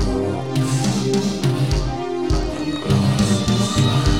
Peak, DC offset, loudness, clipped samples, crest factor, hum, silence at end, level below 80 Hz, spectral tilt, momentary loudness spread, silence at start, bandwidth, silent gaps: -4 dBFS; 0.9%; -20 LUFS; under 0.1%; 14 dB; none; 0 s; -28 dBFS; -5.5 dB/octave; 6 LU; 0 s; 15.5 kHz; none